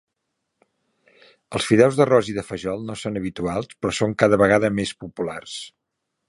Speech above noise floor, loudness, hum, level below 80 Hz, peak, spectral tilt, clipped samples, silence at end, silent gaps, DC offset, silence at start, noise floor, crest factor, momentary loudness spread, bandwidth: 58 dB; -21 LUFS; none; -52 dBFS; 0 dBFS; -5.5 dB/octave; under 0.1%; 0.6 s; none; under 0.1%; 1.5 s; -79 dBFS; 22 dB; 14 LU; 11.5 kHz